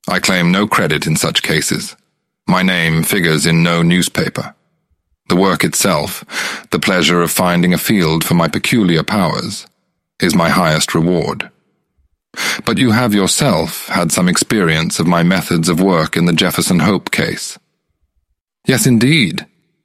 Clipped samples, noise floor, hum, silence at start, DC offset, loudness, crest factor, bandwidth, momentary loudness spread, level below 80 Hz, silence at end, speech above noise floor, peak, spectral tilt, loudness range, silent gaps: under 0.1%; -66 dBFS; none; 0.05 s; under 0.1%; -13 LUFS; 14 dB; 16 kHz; 9 LU; -44 dBFS; 0.4 s; 53 dB; 0 dBFS; -4.5 dB/octave; 3 LU; 18.41-18.45 s